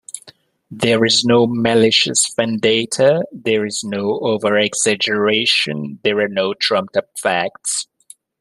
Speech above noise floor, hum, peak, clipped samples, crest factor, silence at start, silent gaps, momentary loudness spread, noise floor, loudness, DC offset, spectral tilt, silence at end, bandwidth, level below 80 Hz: 31 dB; none; 0 dBFS; under 0.1%; 16 dB; 0.15 s; none; 9 LU; -48 dBFS; -16 LUFS; under 0.1%; -3 dB/octave; 0.55 s; 13 kHz; -60 dBFS